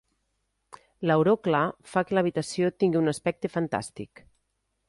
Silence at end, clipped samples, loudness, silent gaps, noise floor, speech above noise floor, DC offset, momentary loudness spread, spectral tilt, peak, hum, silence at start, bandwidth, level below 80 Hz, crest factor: 0.85 s; under 0.1%; -26 LUFS; none; -77 dBFS; 51 dB; under 0.1%; 10 LU; -6.5 dB/octave; -10 dBFS; none; 1 s; 11.5 kHz; -64 dBFS; 18 dB